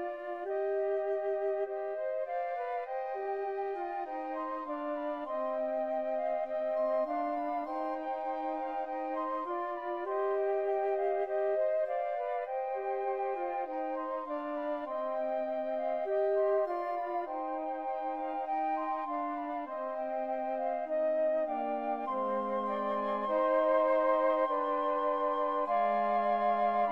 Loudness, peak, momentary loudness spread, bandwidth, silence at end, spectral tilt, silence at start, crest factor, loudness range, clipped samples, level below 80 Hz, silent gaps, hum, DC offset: -33 LUFS; -18 dBFS; 7 LU; 5.6 kHz; 0 s; -7 dB/octave; 0 s; 14 dB; 6 LU; under 0.1%; -72 dBFS; none; none; under 0.1%